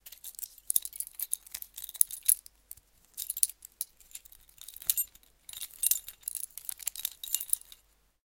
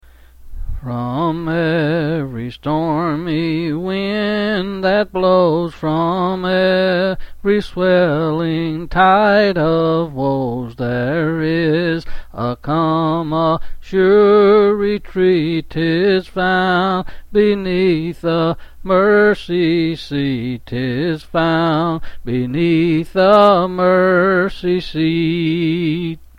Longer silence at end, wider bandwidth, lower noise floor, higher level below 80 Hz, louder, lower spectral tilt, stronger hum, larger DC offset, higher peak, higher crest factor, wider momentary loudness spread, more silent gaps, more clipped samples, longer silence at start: first, 0.65 s vs 0.15 s; first, 17 kHz vs 10.5 kHz; first, -65 dBFS vs -39 dBFS; second, -68 dBFS vs -36 dBFS; second, -32 LUFS vs -16 LUFS; second, 3.5 dB/octave vs -8 dB/octave; neither; neither; about the same, 0 dBFS vs 0 dBFS; first, 36 dB vs 16 dB; first, 20 LU vs 10 LU; neither; neither; second, 0.05 s vs 0.4 s